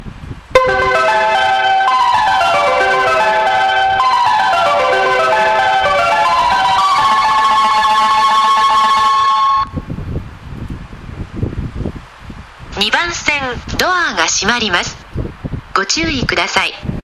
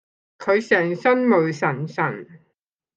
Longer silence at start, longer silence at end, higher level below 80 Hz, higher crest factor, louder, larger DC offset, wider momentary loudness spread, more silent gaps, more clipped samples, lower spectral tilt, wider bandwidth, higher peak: second, 0 s vs 0.4 s; second, 0.05 s vs 0.6 s; first, -34 dBFS vs -72 dBFS; about the same, 14 dB vs 18 dB; first, -12 LUFS vs -20 LUFS; neither; first, 15 LU vs 8 LU; neither; neither; second, -3 dB/octave vs -7 dB/octave; first, 14 kHz vs 8 kHz; first, 0 dBFS vs -4 dBFS